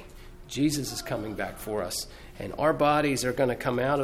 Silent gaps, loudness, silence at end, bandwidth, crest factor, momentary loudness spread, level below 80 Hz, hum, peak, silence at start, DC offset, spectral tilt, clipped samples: none; -28 LUFS; 0 s; 16.5 kHz; 18 dB; 13 LU; -48 dBFS; none; -10 dBFS; 0 s; under 0.1%; -4.5 dB/octave; under 0.1%